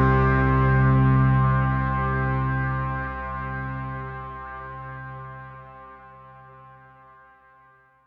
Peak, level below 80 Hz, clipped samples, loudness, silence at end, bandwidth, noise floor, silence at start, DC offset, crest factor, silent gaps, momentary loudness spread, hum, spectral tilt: -8 dBFS; -34 dBFS; under 0.1%; -23 LUFS; 1.35 s; 4.2 kHz; -56 dBFS; 0 s; under 0.1%; 16 dB; none; 21 LU; 60 Hz at -75 dBFS; -10.5 dB/octave